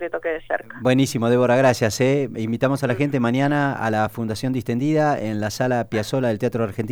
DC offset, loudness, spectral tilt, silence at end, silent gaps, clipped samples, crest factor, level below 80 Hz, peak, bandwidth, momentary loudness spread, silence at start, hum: under 0.1%; -21 LUFS; -6 dB/octave; 0 s; none; under 0.1%; 16 dB; -54 dBFS; -4 dBFS; over 20 kHz; 8 LU; 0 s; none